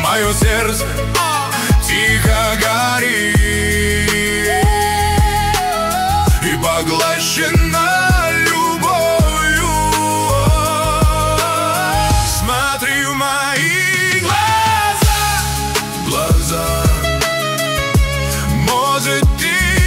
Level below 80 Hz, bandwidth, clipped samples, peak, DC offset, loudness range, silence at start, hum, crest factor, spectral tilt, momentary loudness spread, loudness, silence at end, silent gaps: -22 dBFS; 16.5 kHz; under 0.1%; -2 dBFS; under 0.1%; 2 LU; 0 s; none; 12 dB; -3.5 dB/octave; 3 LU; -14 LUFS; 0 s; none